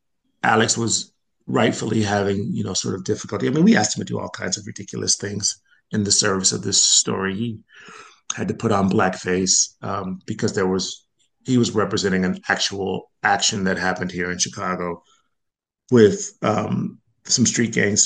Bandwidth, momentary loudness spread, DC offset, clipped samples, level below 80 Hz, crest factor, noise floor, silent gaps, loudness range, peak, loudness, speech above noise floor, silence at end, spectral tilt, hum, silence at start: 10 kHz; 12 LU; under 0.1%; under 0.1%; -60 dBFS; 20 dB; -81 dBFS; none; 3 LU; 0 dBFS; -20 LUFS; 60 dB; 0 s; -3.5 dB/octave; none; 0.45 s